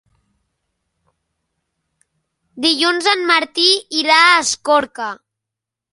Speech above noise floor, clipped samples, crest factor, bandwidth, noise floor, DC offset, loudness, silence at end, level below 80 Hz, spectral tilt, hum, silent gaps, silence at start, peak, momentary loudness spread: 69 dB; under 0.1%; 18 dB; 11.5 kHz; -84 dBFS; under 0.1%; -14 LUFS; 0.8 s; -66 dBFS; 0 dB/octave; none; none; 2.55 s; 0 dBFS; 15 LU